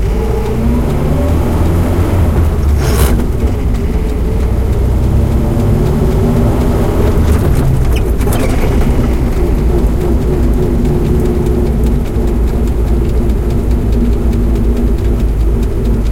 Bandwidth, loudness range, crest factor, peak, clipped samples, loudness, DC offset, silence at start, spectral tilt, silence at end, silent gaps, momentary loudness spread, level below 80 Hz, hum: 16.5 kHz; 2 LU; 10 dB; 0 dBFS; under 0.1%; -13 LUFS; under 0.1%; 0 s; -7.5 dB/octave; 0 s; none; 3 LU; -14 dBFS; none